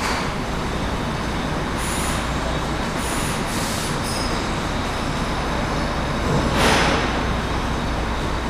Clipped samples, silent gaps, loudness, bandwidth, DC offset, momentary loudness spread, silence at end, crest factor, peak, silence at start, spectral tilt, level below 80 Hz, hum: under 0.1%; none; -22 LUFS; 16 kHz; under 0.1%; 6 LU; 0 s; 20 dB; -2 dBFS; 0 s; -4.5 dB/octave; -30 dBFS; none